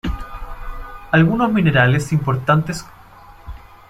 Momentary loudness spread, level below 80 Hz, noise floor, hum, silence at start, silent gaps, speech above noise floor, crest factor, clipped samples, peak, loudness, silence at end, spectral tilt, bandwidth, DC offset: 21 LU; -34 dBFS; -42 dBFS; none; 0.05 s; none; 27 dB; 18 dB; under 0.1%; 0 dBFS; -17 LUFS; 0.3 s; -6.5 dB/octave; 13.5 kHz; under 0.1%